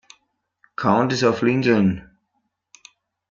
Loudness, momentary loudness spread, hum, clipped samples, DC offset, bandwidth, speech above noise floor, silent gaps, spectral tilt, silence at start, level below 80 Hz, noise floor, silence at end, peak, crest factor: -19 LUFS; 11 LU; none; under 0.1%; under 0.1%; 7.6 kHz; 55 dB; none; -6.5 dB/octave; 0.8 s; -58 dBFS; -73 dBFS; 1.3 s; -4 dBFS; 18 dB